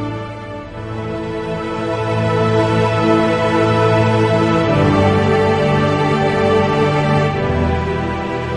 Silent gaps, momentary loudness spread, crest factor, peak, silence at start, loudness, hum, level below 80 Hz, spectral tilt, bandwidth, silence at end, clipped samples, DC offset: none; 11 LU; 14 dB; -2 dBFS; 0 s; -15 LUFS; none; -38 dBFS; -7 dB/octave; 10.5 kHz; 0 s; under 0.1%; under 0.1%